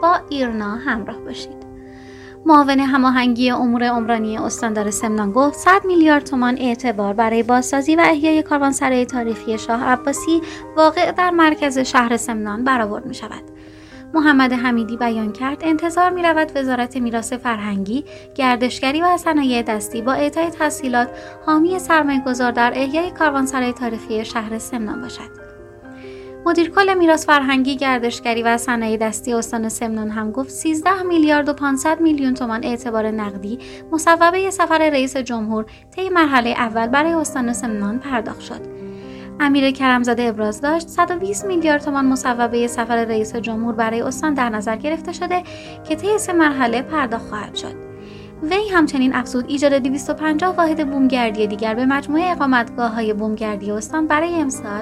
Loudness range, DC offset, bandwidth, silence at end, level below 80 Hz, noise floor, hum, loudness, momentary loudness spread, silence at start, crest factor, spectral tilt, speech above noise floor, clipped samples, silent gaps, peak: 4 LU; under 0.1%; 14 kHz; 0 s; -48 dBFS; -39 dBFS; none; -18 LUFS; 12 LU; 0 s; 18 dB; -4 dB/octave; 21 dB; under 0.1%; none; 0 dBFS